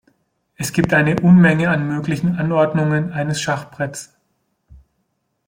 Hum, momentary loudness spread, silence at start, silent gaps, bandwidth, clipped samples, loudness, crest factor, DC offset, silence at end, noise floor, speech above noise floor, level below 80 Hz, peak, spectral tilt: none; 15 LU; 0.6 s; none; 16.5 kHz; under 0.1%; -17 LUFS; 16 dB; under 0.1%; 1.4 s; -70 dBFS; 54 dB; -50 dBFS; -2 dBFS; -6.5 dB/octave